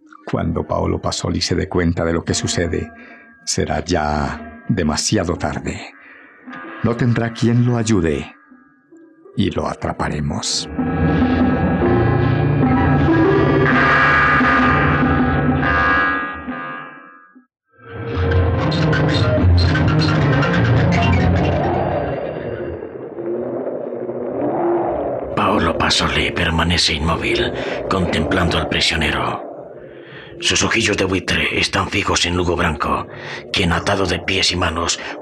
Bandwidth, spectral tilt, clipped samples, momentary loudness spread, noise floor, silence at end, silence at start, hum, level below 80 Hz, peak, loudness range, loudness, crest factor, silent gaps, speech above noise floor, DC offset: 12.5 kHz; -5 dB/octave; under 0.1%; 13 LU; -49 dBFS; 0 s; 0.25 s; none; -36 dBFS; -6 dBFS; 7 LU; -17 LUFS; 12 dB; none; 30 dB; under 0.1%